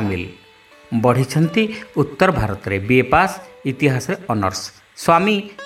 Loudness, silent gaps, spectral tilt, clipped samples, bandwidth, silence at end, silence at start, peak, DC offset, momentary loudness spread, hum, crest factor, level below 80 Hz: -18 LUFS; none; -6 dB/octave; under 0.1%; 16 kHz; 0 s; 0 s; 0 dBFS; under 0.1%; 12 LU; none; 18 dB; -42 dBFS